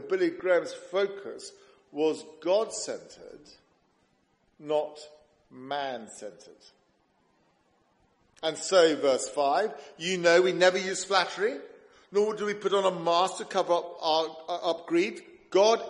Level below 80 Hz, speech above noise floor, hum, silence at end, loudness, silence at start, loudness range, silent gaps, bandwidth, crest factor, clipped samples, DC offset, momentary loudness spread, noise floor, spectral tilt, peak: -76 dBFS; 42 dB; none; 0 s; -27 LUFS; 0 s; 12 LU; none; 11.5 kHz; 20 dB; under 0.1%; under 0.1%; 19 LU; -70 dBFS; -3 dB/octave; -8 dBFS